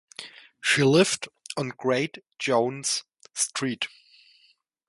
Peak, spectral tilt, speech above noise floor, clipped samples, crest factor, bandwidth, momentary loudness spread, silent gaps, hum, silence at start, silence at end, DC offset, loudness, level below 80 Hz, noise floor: -6 dBFS; -3.5 dB/octave; 39 dB; under 0.1%; 20 dB; 11.5 kHz; 15 LU; none; none; 0.2 s; 1 s; under 0.1%; -25 LUFS; -68 dBFS; -64 dBFS